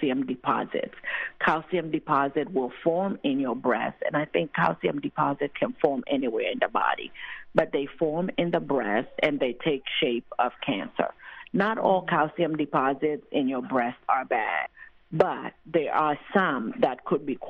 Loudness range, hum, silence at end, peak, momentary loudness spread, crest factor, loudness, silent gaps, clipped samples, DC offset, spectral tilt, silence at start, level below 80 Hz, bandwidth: 1 LU; none; 0 s; -6 dBFS; 6 LU; 20 dB; -27 LUFS; none; under 0.1%; under 0.1%; -8 dB/octave; 0 s; -64 dBFS; 6.6 kHz